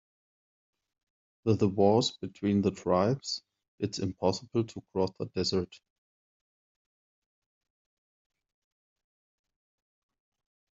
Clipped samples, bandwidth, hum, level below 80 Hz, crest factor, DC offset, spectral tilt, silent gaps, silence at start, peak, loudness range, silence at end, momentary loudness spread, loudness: under 0.1%; 7.8 kHz; none; -68 dBFS; 22 dB; under 0.1%; -6 dB/octave; 3.68-3.78 s; 1.45 s; -12 dBFS; 9 LU; 5 s; 11 LU; -30 LUFS